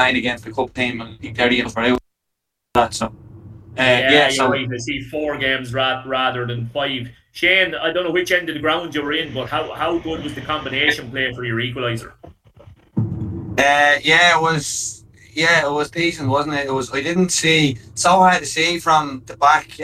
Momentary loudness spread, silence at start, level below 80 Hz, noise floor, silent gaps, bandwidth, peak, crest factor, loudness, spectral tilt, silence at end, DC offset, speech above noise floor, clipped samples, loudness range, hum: 12 LU; 0 s; -48 dBFS; -78 dBFS; none; 15 kHz; -2 dBFS; 18 dB; -18 LUFS; -3.5 dB/octave; 0 s; under 0.1%; 60 dB; under 0.1%; 5 LU; none